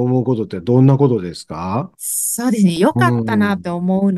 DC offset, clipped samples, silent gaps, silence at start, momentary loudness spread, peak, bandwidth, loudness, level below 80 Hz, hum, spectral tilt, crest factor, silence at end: under 0.1%; under 0.1%; none; 0 s; 10 LU; 0 dBFS; 12.5 kHz; -16 LUFS; -52 dBFS; none; -6 dB/octave; 14 dB; 0 s